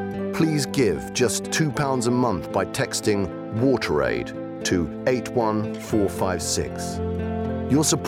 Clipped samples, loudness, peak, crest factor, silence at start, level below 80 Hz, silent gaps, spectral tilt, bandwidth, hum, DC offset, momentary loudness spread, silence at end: under 0.1%; -24 LUFS; -10 dBFS; 14 dB; 0 s; -50 dBFS; none; -4.5 dB/octave; 16.5 kHz; none; under 0.1%; 6 LU; 0 s